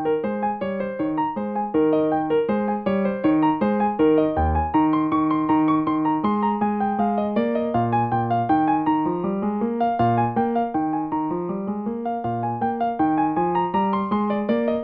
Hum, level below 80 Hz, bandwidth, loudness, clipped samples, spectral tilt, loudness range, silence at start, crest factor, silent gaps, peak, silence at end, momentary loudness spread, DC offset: none; -42 dBFS; 4.5 kHz; -22 LUFS; under 0.1%; -11 dB/octave; 3 LU; 0 s; 14 dB; none; -8 dBFS; 0 s; 6 LU; under 0.1%